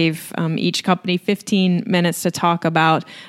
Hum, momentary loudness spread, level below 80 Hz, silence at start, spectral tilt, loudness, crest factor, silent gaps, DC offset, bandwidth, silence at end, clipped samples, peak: none; 4 LU; -64 dBFS; 0 s; -5 dB/octave; -19 LUFS; 18 dB; none; under 0.1%; 15 kHz; 0 s; under 0.1%; 0 dBFS